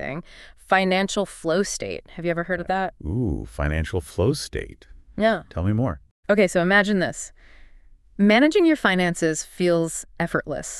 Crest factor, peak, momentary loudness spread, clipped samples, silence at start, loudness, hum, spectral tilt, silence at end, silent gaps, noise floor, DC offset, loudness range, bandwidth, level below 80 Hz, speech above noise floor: 18 dB; -4 dBFS; 14 LU; under 0.1%; 0 s; -22 LUFS; none; -5 dB/octave; 0 s; 6.11-6.23 s; -49 dBFS; under 0.1%; 6 LU; 13 kHz; -40 dBFS; 27 dB